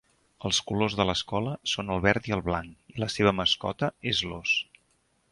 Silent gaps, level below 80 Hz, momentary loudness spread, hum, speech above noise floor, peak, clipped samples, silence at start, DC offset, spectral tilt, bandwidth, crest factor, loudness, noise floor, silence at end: none; -50 dBFS; 8 LU; none; 42 dB; -6 dBFS; under 0.1%; 0.4 s; under 0.1%; -4 dB/octave; 11.5 kHz; 22 dB; -27 LUFS; -69 dBFS; 0.7 s